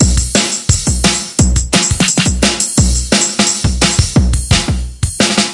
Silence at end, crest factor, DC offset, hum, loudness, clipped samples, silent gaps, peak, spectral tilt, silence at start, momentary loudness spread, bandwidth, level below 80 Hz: 0 s; 12 dB; under 0.1%; none; -12 LUFS; under 0.1%; none; 0 dBFS; -3.5 dB/octave; 0 s; 2 LU; 11.5 kHz; -20 dBFS